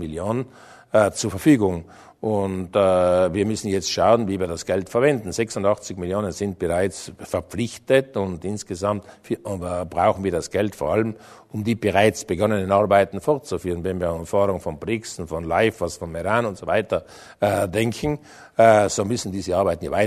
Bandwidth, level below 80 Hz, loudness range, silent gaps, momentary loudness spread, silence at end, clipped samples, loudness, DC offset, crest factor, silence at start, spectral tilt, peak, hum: 13.5 kHz; -48 dBFS; 4 LU; none; 11 LU; 0 s; under 0.1%; -22 LUFS; under 0.1%; 20 dB; 0 s; -5.5 dB/octave; -2 dBFS; none